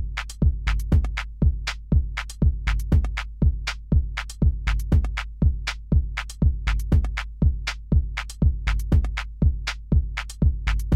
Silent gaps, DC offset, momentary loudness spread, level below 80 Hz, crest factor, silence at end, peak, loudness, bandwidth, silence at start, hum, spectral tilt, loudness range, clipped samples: none; under 0.1%; 7 LU; -24 dBFS; 14 dB; 0 s; -8 dBFS; -25 LUFS; 12 kHz; 0 s; none; -6 dB/octave; 0 LU; under 0.1%